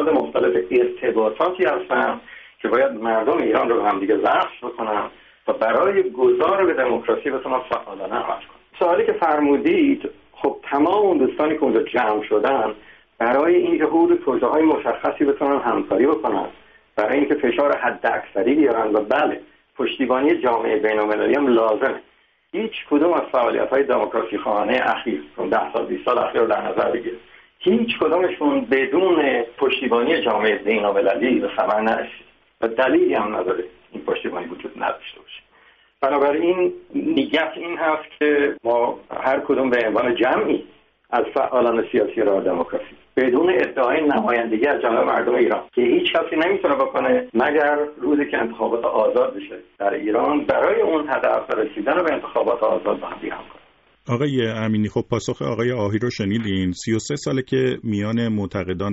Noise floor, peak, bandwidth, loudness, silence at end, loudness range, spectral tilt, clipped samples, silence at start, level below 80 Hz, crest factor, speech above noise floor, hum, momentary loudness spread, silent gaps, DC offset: -54 dBFS; -6 dBFS; 8 kHz; -20 LUFS; 0 s; 4 LU; -4 dB/octave; under 0.1%; 0 s; -58 dBFS; 14 dB; 35 dB; none; 9 LU; none; under 0.1%